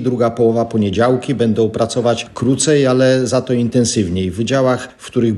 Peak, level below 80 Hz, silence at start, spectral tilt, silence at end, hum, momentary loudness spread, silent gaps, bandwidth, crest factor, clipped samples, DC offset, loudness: -2 dBFS; -48 dBFS; 0 s; -5.5 dB/octave; 0 s; none; 6 LU; none; 12 kHz; 12 dB; under 0.1%; under 0.1%; -15 LUFS